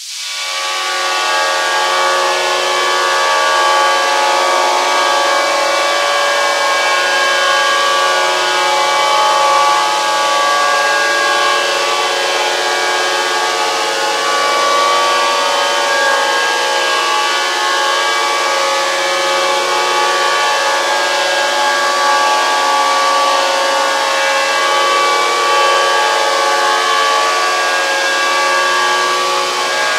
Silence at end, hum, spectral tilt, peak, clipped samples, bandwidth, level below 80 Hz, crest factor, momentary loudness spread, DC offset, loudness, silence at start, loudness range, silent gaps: 0 s; none; 1 dB/octave; 0 dBFS; under 0.1%; 16 kHz; -76 dBFS; 14 dB; 2 LU; under 0.1%; -12 LUFS; 0 s; 1 LU; none